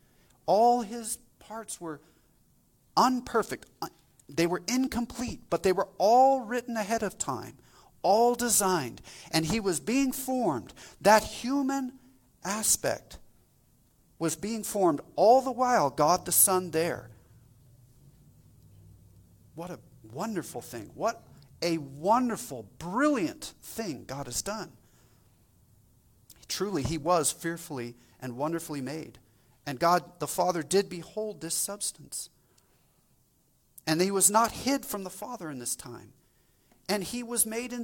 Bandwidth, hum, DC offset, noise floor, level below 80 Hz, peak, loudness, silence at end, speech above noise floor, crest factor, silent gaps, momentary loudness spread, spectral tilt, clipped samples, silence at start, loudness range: 18.5 kHz; none; under 0.1%; -67 dBFS; -60 dBFS; -6 dBFS; -28 LUFS; 0 s; 39 dB; 24 dB; none; 18 LU; -3.5 dB/octave; under 0.1%; 0.45 s; 10 LU